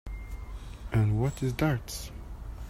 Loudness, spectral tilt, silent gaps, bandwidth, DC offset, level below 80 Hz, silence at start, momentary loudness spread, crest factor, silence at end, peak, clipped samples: -30 LUFS; -6.5 dB/octave; none; 15.5 kHz; under 0.1%; -40 dBFS; 0.05 s; 16 LU; 18 dB; 0 s; -14 dBFS; under 0.1%